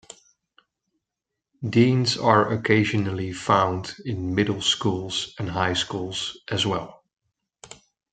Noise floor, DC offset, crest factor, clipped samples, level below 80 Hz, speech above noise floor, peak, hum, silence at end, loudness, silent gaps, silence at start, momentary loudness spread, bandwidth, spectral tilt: -85 dBFS; under 0.1%; 22 dB; under 0.1%; -58 dBFS; 62 dB; -2 dBFS; none; 0.4 s; -23 LUFS; none; 1.6 s; 11 LU; 9.4 kHz; -5 dB/octave